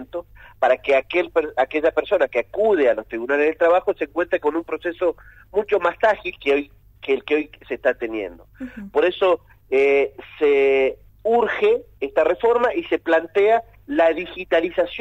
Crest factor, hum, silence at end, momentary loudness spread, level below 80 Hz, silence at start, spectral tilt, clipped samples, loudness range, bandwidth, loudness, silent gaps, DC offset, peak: 14 dB; none; 0 s; 10 LU; -52 dBFS; 0 s; -5.5 dB/octave; under 0.1%; 3 LU; 7.8 kHz; -20 LUFS; none; under 0.1%; -6 dBFS